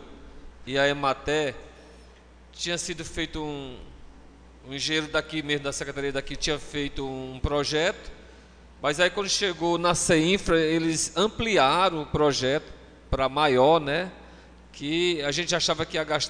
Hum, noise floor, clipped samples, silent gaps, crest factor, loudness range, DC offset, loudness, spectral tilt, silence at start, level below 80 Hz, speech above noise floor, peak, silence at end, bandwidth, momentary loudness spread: none; -51 dBFS; under 0.1%; none; 20 dB; 8 LU; under 0.1%; -25 LUFS; -3.5 dB/octave; 0 s; -44 dBFS; 26 dB; -6 dBFS; 0 s; 10 kHz; 13 LU